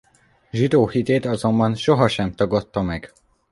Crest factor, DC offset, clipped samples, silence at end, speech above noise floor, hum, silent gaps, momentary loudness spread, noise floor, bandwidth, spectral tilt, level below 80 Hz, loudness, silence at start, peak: 18 dB; under 0.1%; under 0.1%; 0.45 s; 28 dB; none; none; 8 LU; -47 dBFS; 11.5 kHz; -7 dB/octave; -46 dBFS; -20 LUFS; 0.55 s; -2 dBFS